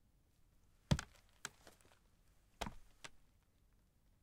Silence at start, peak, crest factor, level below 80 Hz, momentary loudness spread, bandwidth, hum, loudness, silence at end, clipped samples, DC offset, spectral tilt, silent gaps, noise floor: 0.9 s; -22 dBFS; 28 dB; -58 dBFS; 21 LU; 16 kHz; none; -45 LUFS; 1.05 s; under 0.1%; under 0.1%; -5 dB/octave; none; -73 dBFS